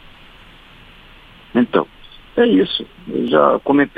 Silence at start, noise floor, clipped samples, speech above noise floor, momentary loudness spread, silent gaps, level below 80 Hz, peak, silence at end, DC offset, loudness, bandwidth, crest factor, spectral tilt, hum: 1.55 s; -43 dBFS; under 0.1%; 28 dB; 11 LU; none; -48 dBFS; 0 dBFS; 0.1 s; under 0.1%; -17 LUFS; 4.9 kHz; 18 dB; -7.5 dB/octave; none